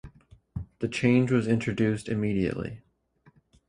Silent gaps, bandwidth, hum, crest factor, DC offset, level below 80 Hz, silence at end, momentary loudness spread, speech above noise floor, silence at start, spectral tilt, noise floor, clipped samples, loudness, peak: none; 11 kHz; none; 20 dB; under 0.1%; -52 dBFS; 0.9 s; 17 LU; 37 dB; 0.05 s; -7 dB/octave; -63 dBFS; under 0.1%; -27 LUFS; -8 dBFS